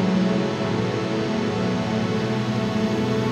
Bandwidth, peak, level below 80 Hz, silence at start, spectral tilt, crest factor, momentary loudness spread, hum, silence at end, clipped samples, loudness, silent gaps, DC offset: 10.5 kHz; -10 dBFS; -52 dBFS; 0 s; -6.5 dB/octave; 12 dB; 2 LU; none; 0 s; under 0.1%; -23 LUFS; none; under 0.1%